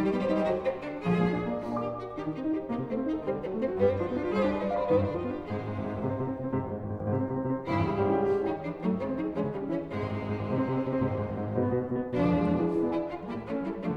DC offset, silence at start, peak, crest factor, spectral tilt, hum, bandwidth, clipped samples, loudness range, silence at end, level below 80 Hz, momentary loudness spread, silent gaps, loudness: under 0.1%; 0 s; -12 dBFS; 16 dB; -9.5 dB/octave; none; 8.2 kHz; under 0.1%; 2 LU; 0 s; -54 dBFS; 7 LU; none; -30 LUFS